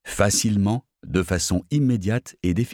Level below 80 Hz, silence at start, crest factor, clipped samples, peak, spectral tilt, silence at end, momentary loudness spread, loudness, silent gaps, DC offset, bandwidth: -42 dBFS; 0.05 s; 18 dB; under 0.1%; -6 dBFS; -5 dB/octave; 0 s; 7 LU; -22 LUFS; none; under 0.1%; 18.5 kHz